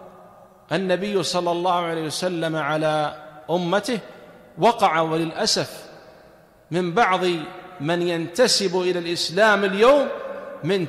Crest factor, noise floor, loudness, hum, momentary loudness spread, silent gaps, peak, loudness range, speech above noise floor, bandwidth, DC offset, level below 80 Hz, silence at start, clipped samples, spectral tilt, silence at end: 16 dB; -51 dBFS; -21 LUFS; none; 12 LU; none; -6 dBFS; 4 LU; 30 dB; 15 kHz; under 0.1%; -60 dBFS; 0 s; under 0.1%; -4 dB/octave; 0 s